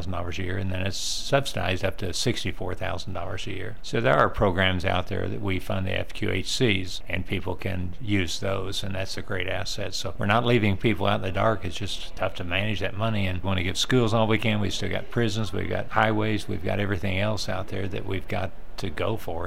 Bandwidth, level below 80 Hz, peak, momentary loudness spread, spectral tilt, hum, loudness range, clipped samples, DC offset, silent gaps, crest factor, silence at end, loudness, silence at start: 16 kHz; -40 dBFS; -6 dBFS; 9 LU; -5 dB/octave; none; 3 LU; under 0.1%; 3%; none; 22 dB; 0 s; -27 LUFS; 0 s